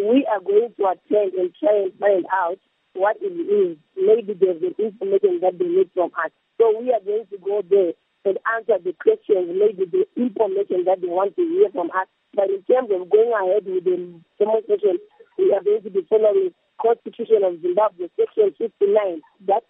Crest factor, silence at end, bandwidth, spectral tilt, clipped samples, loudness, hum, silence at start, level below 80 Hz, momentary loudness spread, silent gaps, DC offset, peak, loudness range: 16 dB; 0.1 s; 3.8 kHz; -10 dB/octave; under 0.1%; -21 LUFS; none; 0 s; -82 dBFS; 7 LU; none; under 0.1%; -4 dBFS; 1 LU